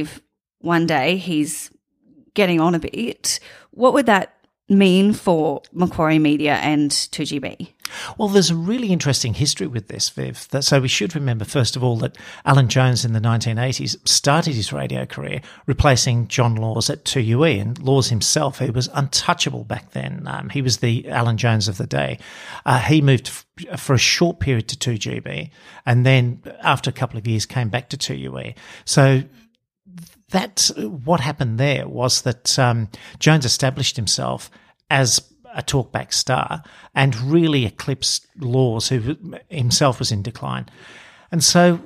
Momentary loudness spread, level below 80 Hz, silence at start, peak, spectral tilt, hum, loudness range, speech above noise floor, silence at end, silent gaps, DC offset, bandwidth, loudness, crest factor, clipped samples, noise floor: 13 LU; -46 dBFS; 0 s; -2 dBFS; -4.5 dB/octave; none; 3 LU; 36 dB; 0 s; none; under 0.1%; 15.5 kHz; -19 LUFS; 18 dB; under 0.1%; -55 dBFS